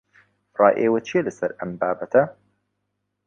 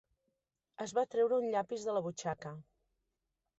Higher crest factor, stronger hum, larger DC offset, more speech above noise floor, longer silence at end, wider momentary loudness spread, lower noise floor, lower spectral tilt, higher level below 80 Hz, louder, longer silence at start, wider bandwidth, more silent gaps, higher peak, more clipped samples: first, 22 dB vs 16 dB; first, 50 Hz at -55 dBFS vs none; neither; first, 56 dB vs 52 dB; about the same, 0.95 s vs 1 s; second, 11 LU vs 14 LU; second, -77 dBFS vs -87 dBFS; first, -7 dB/octave vs -5 dB/octave; first, -66 dBFS vs -76 dBFS; first, -22 LUFS vs -36 LUFS; second, 0.6 s vs 0.8 s; about the same, 7.6 kHz vs 8.2 kHz; neither; first, -2 dBFS vs -22 dBFS; neither